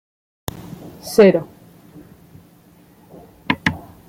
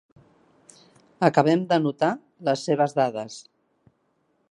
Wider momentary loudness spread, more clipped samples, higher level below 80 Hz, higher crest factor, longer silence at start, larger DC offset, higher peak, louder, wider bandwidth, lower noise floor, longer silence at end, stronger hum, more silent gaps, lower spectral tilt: first, 25 LU vs 12 LU; neither; first, -52 dBFS vs -72 dBFS; about the same, 20 dB vs 22 dB; second, 0.85 s vs 1.2 s; neither; about the same, -2 dBFS vs -2 dBFS; first, -17 LUFS vs -23 LUFS; first, 16.5 kHz vs 11.5 kHz; second, -50 dBFS vs -69 dBFS; second, 0.3 s vs 1.1 s; neither; neither; about the same, -5.5 dB/octave vs -6 dB/octave